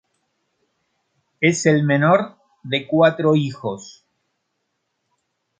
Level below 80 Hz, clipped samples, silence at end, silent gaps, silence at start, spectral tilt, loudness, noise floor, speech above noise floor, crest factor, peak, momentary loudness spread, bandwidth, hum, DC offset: -66 dBFS; under 0.1%; 1.7 s; none; 1.4 s; -5.5 dB/octave; -18 LUFS; -74 dBFS; 56 dB; 20 dB; -2 dBFS; 14 LU; 9.4 kHz; none; under 0.1%